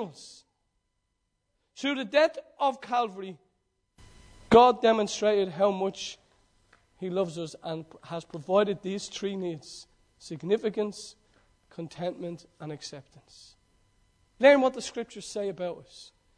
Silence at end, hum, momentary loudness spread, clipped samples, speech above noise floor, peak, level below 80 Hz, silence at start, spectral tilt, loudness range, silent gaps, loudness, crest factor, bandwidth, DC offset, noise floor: 0.35 s; none; 22 LU; under 0.1%; 51 dB; -6 dBFS; -62 dBFS; 0 s; -4.5 dB/octave; 10 LU; none; -27 LUFS; 24 dB; 10.5 kHz; under 0.1%; -78 dBFS